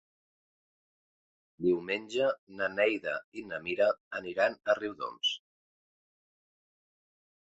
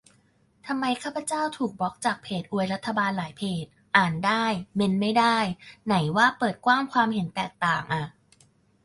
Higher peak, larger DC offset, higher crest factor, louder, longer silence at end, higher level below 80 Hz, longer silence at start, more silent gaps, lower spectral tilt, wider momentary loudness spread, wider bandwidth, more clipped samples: second, -12 dBFS vs -4 dBFS; neither; about the same, 22 dB vs 22 dB; second, -32 LUFS vs -25 LUFS; first, 2.05 s vs 0.75 s; second, -74 dBFS vs -62 dBFS; first, 1.6 s vs 0.65 s; first, 2.39-2.47 s, 3.24-3.32 s, 4.00-4.11 s vs none; about the same, -4 dB/octave vs -5 dB/octave; about the same, 9 LU vs 10 LU; second, 8 kHz vs 11.5 kHz; neither